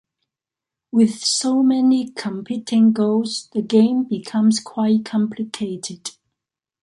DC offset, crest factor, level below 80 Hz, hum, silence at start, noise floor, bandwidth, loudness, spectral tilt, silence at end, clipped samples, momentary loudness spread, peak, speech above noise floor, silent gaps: under 0.1%; 16 dB; -68 dBFS; none; 0.95 s; -87 dBFS; 11.5 kHz; -19 LUFS; -5 dB/octave; 0.7 s; under 0.1%; 11 LU; -4 dBFS; 69 dB; none